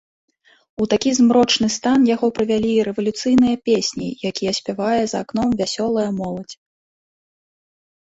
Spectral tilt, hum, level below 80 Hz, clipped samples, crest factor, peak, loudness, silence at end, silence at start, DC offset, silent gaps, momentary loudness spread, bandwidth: -4.5 dB/octave; none; -52 dBFS; under 0.1%; 16 dB; -4 dBFS; -19 LUFS; 1.55 s; 0.8 s; under 0.1%; none; 10 LU; 8 kHz